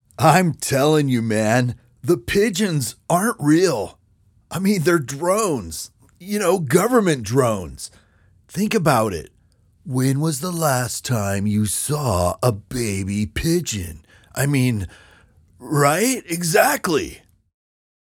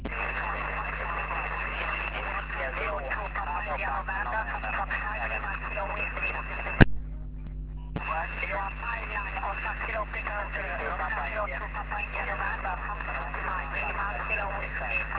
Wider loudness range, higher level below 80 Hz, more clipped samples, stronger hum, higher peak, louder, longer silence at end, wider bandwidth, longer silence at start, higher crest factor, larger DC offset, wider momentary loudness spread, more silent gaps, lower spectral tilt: about the same, 3 LU vs 3 LU; second, -46 dBFS vs -38 dBFS; neither; neither; about the same, 0 dBFS vs 0 dBFS; first, -20 LUFS vs -31 LUFS; first, 0.85 s vs 0 s; first, 18 kHz vs 4 kHz; first, 0.2 s vs 0 s; second, 20 dB vs 30 dB; neither; first, 12 LU vs 4 LU; neither; about the same, -5 dB/octave vs -4 dB/octave